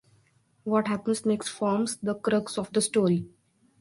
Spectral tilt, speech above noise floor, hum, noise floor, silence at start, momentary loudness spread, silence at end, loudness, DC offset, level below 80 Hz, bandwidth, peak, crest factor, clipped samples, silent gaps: -5 dB/octave; 39 dB; none; -65 dBFS; 0.65 s; 5 LU; 0.55 s; -27 LUFS; under 0.1%; -66 dBFS; 11.5 kHz; -10 dBFS; 18 dB; under 0.1%; none